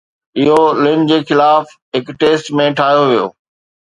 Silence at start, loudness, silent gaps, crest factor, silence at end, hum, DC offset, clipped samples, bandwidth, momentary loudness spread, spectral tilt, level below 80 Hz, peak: 0.35 s; -13 LUFS; 1.82-1.92 s; 12 dB; 0.55 s; none; under 0.1%; under 0.1%; 11 kHz; 11 LU; -6 dB/octave; -56 dBFS; 0 dBFS